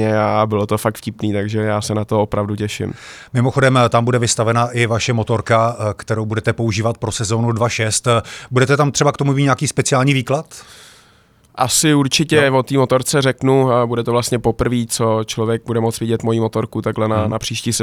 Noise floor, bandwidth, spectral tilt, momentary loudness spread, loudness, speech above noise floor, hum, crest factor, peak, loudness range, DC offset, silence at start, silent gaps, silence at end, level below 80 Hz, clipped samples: -51 dBFS; 15.5 kHz; -5 dB/octave; 8 LU; -17 LUFS; 35 dB; none; 16 dB; -2 dBFS; 3 LU; under 0.1%; 0 s; none; 0 s; -46 dBFS; under 0.1%